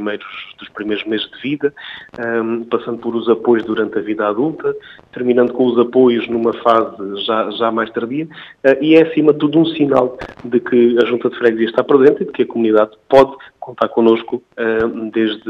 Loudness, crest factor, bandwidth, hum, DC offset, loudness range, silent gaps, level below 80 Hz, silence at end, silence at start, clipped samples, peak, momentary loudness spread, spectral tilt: -15 LUFS; 16 dB; 6.6 kHz; none; under 0.1%; 5 LU; none; -54 dBFS; 0 s; 0 s; under 0.1%; 0 dBFS; 12 LU; -7.5 dB/octave